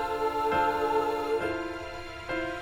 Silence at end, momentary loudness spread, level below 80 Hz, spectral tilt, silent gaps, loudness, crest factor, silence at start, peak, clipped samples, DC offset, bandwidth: 0 s; 11 LU; -50 dBFS; -5 dB/octave; none; -29 LUFS; 14 dB; 0 s; -16 dBFS; under 0.1%; under 0.1%; 18.5 kHz